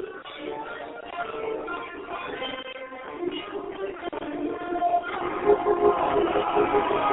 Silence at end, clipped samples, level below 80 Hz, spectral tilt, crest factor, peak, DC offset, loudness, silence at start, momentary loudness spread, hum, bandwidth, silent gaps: 0 s; under 0.1%; -54 dBFS; -9 dB/octave; 18 dB; -8 dBFS; under 0.1%; -27 LUFS; 0 s; 14 LU; none; 4.1 kHz; none